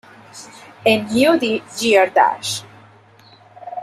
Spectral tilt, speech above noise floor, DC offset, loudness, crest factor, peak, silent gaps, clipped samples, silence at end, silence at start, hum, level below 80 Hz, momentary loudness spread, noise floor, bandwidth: -3.5 dB/octave; 31 dB; under 0.1%; -17 LUFS; 18 dB; -2 dBFS; none; under 0.1%; 0 s; 0.35 s; none; -60 dBFS; 23 LU; -48 dBFS; 14.5 kHz